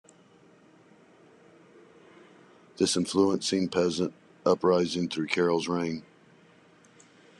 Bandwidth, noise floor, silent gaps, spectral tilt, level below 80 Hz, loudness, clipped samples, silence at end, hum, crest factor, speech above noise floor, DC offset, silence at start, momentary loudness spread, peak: 12 kHz; -58 dBFS; none; -4.5 dB/octave; -68 dBFS; -27 LUFS; under 0.1%; 1.35 s; none; 22 dB; 32 dB; under 0.1%; 2.8 s; 7 LU; -8 dBFS